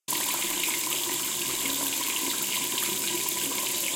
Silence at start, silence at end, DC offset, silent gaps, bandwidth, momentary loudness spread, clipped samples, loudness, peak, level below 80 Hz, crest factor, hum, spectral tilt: 0.1 s; 0 s; under 0.1%; none; 17 kHz; 1 LU; under 0.1%; -26 LUFS; -10 dBFS; -66 dBFS; 18 dB; none; 0 dB/octave